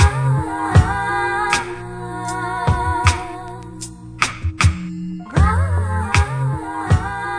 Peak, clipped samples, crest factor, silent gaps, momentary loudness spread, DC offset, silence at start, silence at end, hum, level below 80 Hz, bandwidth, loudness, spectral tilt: 0 dBFS; under 0.1%; 18 dB; none; 14 LU; under 0.1%; 0 s; 0 s; none; -26 dBFS; 10.5 kHz; -19 LUFS; -5 dB/octave